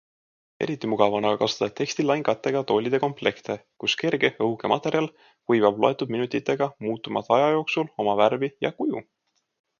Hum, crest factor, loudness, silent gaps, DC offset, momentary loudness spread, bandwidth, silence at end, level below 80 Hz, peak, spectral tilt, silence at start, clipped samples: none; 22 dB; -24 LUFS; none; under 0.1%; 8 LU; 7.2 kHz; 0.75 s; -68 dBFS; -4 dBFS; -5 dB/octave; 0.6 s; under 0.1%